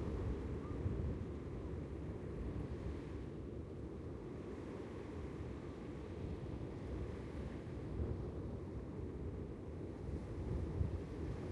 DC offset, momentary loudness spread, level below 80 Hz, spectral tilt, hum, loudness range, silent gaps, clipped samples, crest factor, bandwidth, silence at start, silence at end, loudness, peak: under 0.1%; 6 LU; -50 dBFS; -9 dB/octave; none; 3 LU; none; under 0.1%; 18 dB; 10.5 kHz; 0 s; 0 s; -46 LUFS; -26 dBFS